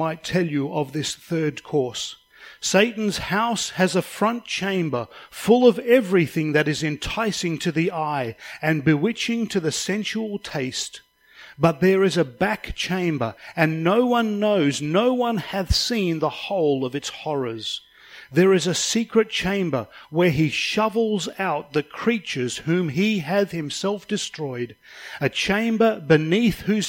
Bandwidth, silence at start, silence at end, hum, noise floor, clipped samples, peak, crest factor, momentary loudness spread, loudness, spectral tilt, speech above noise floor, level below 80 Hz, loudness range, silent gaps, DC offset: 16.5 kHz; 0 s; 0 s; none; -48 dBFS; under 0.1%; -4 dBFS; 20 dB; 9 LU; -22 LUFS; -5 dB/octave; 26 dB; -46 dBFS; 3 LU; none; under 0.1%